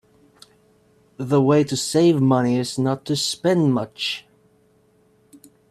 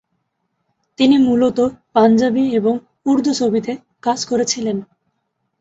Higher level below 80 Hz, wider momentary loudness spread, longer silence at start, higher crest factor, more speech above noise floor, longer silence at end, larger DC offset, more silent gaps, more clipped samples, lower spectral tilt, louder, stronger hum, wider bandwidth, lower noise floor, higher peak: second, -62 dBFS vs -56 dBFS; about the same, 9 LU vs 9 LU; first, 1.2 s vs 1 s; about the same, 18 dB vs 16 dB; second, 40 dB vs 56 dB; first, 1.5 s vs 0.75 s; neither; neither; neither; about the same, -5.5 dB/octave vs -4.5 dB/octave; second, -20 LUFS vs -17 LUFS; neither; first, 14.5 kHz vs 8 kHz; second, -59 dBFS vs -71 dBFS; about the same, -4 dBFS vs -2 dBFS